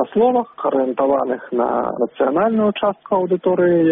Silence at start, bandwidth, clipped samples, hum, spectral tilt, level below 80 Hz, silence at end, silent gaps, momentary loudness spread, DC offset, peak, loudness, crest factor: 0 s; 3.8 kHz; under 0.1%; none; -6 dB/octave; -58 dBFS; 0 s; none; 5 LU; under 0.1%; -4 dBFS; -18 LUFS; 12 dB